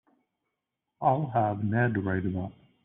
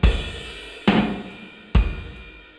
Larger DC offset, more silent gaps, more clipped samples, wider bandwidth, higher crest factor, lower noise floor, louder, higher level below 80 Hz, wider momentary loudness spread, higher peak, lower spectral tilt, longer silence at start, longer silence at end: neither; neither; neither; second, 3.8 kHz vs 10 kHz; about the same, 18 dB vs 18 dB; first, -84 dBFS vs -41 dBFS; second, -28 LUFS vs -24 LUFS; second, -64 dBFS vs -26 dBFS; second, 8 LU vs 19 LU; second, -12 dBFS vs -4 dBFS; about the same, -8 dB/octave vs -7 dB/octave; first, 1 s vs 0 s; first, 0.35 s vs 0.2 s